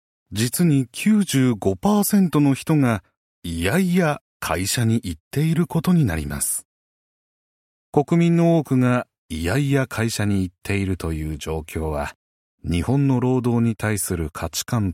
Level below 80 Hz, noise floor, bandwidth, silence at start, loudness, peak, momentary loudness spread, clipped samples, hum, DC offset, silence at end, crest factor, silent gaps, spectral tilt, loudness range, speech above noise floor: -42 dBFS; under -90 dBFS; 16.5 kHz; 0.3 s; -21 LUFS; -4 dBFS; 10 LU; under 0.1%; none; under 0.1%; 0 s; 18 dB; 3.17-3.42 s, 4.21-4.40 s, 5.20-5.31 s, 6.65-7.93 s, 9.18-9.29 s, 12.15-12.58 s; -6 dB/octave; 4 LU; over 70 dB